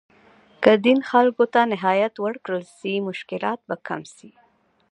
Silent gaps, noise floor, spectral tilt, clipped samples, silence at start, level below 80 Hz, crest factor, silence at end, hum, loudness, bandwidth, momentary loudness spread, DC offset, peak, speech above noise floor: none; -54 dBFS; -6 dB/octave; under 0.1%; 0.6 s; -72 dBFS; 22 dB; 0.65 s; none; -21 LUFS; 10.5 kHz; 12 LU; under 0.1%; 0 dBFS; 33 dB